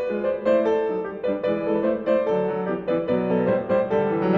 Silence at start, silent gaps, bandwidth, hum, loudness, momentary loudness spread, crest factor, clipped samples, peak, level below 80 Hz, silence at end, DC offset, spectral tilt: 0 s; none; 6.2 kHz; none; -23 LUFS; 5 LU; 14 dB; under 0.1%; -8 dBFS; -56 dBFS; 0 s; under 0.1%; -9 dB/octave